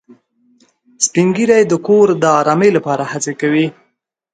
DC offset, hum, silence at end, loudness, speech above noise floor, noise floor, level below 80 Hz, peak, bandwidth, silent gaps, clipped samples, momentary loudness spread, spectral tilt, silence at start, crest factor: under 0.1%; none; 0.65 s; -13 LUFS; 53 dB; -66 dBFS; -60 dBFS; 0 dBFS; 9.4 kHz; none; under 0.1%; 7 LU; -5 dB/octave; 1 s; 14 dB